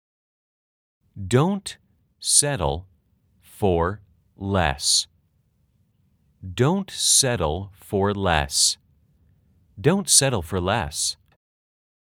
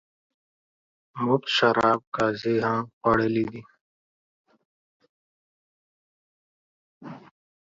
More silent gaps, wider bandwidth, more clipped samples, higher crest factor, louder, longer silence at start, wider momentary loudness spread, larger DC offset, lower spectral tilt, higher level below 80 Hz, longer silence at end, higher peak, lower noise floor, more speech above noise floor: second, none vs 2.07-2.12 s, 2.93-3.01 s, 3.81-4.45 s, 4.65-5.00 s, 5.09-7.01 s; first, 19.5 kHz vs 7.8 kHz; neither; about the same, 24 dB vs 22 dB; first, -21 LUFS vs -24 LUFS; about the same, 1.15 s vs 1.15 s; second, 17 LU vs 23 LU; neither; second, -3 dB/octave vs -5.5 dB/octave; first, -46 dBFS vs -58 dBFS; first, 1.05 s vs 0.55 s; first, 0 dBFS vs -8 dBFS; second, -65 dBFS vs under -90 dBFS; second, 44 dB vs over 66 dB